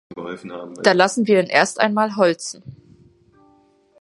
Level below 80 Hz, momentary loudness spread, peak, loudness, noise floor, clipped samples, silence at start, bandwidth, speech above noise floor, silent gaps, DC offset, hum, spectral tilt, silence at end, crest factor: -66 dBFS; 17 LU; 0 dBFS; -17 LUFS; -56 dBFS; under 0.1%; 0.1 s; 11.5 kHz; 37 dB; none; under 0.1%; none; -4 dB/octave; 1.3 s; 20 dB